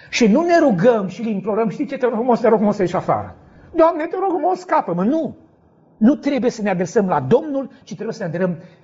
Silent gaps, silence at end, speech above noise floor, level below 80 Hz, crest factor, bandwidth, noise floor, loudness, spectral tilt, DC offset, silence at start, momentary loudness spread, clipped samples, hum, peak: none; 0.15 s; 35 dB; -56 dBFS; 16 dB; 7.8 kHz; -53 dBFS; -18 LUFS; -6 dB/octave; under 0.1%; 0.1 s; 11 LU; under 0.1%; none; -2 dBFS